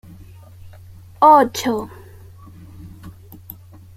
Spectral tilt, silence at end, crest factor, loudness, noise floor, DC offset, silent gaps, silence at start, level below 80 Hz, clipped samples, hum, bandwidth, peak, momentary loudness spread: -4.5 dB/octave; 0.85 s; 20 dB; -15 LUFS; -41 dBFS; under 0.1%; none; 0.65 s; -50 dBFS; under 0.1%; none; 16 kHz; -2 dBFS; 29 LU